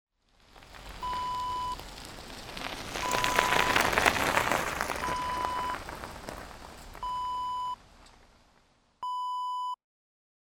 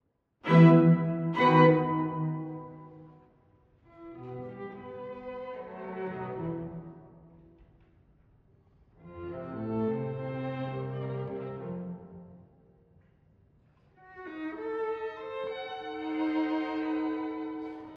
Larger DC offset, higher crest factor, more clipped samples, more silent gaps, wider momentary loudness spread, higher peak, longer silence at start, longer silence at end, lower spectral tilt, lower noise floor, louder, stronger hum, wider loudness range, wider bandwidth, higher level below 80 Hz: neither; first, 30 dB vs 22 dB; neither; neither; second, 19 LU vs 23 LU; first, -2 dBFS vs -8 dBFS; about the same, 0.55 s vs 0.45 s; first, 0.8 s vs 0 s; second, -2.5 dB/octave vs -9.5 dB/octave; about the same, -66 dBFS vs -64 dBFS; about the same, -30 LUFS vs -29 LUFS; neither; second, 10 LU vs 17 LU; first, over 20 kHz vs 4.9 kHz; first, -50 dBFS vs -66 dBFS